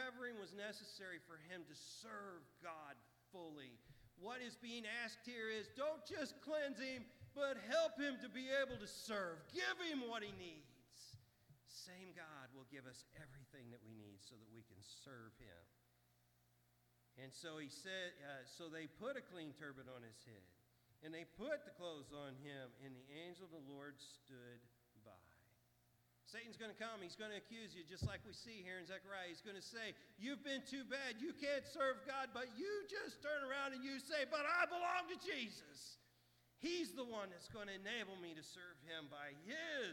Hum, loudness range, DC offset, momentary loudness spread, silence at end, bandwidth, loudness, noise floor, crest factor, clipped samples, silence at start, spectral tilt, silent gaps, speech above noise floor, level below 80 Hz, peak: 60 Hz at -80 dBFS; 16 LU; under 0.1%; 18 LU; 0 s; 19 kHz; -48 LUFS; -78 dBFS; 24 dB; under 0.1%; 0 s; -3.5 dB/octave; none; 29 dB; -78 dBFS; -26 dBFS